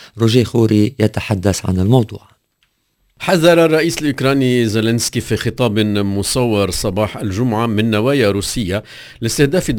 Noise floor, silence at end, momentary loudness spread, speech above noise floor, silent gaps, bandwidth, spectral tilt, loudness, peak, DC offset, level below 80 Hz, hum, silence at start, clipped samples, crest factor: -64 dBFS; 0 s; 7 LU; 49 dB; none; 16 kHz; -5.5 dB/octave; -15 LUFS; 0 dBFS; under 0.1%; -36 dBFS; none; 0 s; under 0.1%; 16 dB